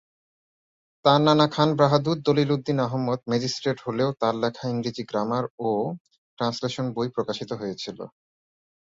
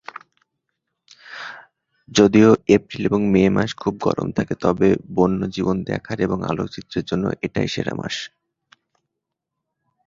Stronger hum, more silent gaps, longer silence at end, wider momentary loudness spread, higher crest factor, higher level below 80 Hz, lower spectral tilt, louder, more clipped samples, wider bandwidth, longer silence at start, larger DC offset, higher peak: neither; first, 5.50-5.58 s, 6.00-6.05 s, 6.18-6.37 s vs none; second, 0.75 s vs 1.8 s; second, 12 LU vs 15 LU; about the same, 22 dB vs 20 dB; second, -64 dBFS vs -48 dBFS; about the same, -6 dB/octave vs -6 dB/octave; second, -24 LUFS vs -20 LUFS; neither; about the same, 7.8 kHz vs 7.6 kHz; second, 1.05 s vs 1.25 s; neither; about the same, -4 dBFS vs -2 dBFS